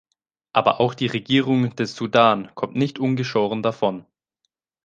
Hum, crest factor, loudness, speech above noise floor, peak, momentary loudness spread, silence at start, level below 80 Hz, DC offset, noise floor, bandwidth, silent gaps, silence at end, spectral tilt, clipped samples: none; 20 dB; -21 LUFS; 56 dB; -2 dBFS; 8 LU; 0.55 s; -64 dBFS; under 0.1%; -76 dBFS; 7.6 kHz; none; 0.85 s; -6.5 dB/octave; under 0.1%